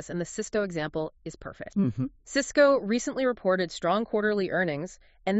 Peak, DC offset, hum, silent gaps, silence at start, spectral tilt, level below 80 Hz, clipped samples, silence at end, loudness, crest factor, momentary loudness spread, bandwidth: -8 dBFS; under 0.1%; none; none; 0 s; -4.5 dB/octave; -56 dBFS; under 0.1%; 0 s; -27 LUFS; 20 dB; 14 LU; 8 kHz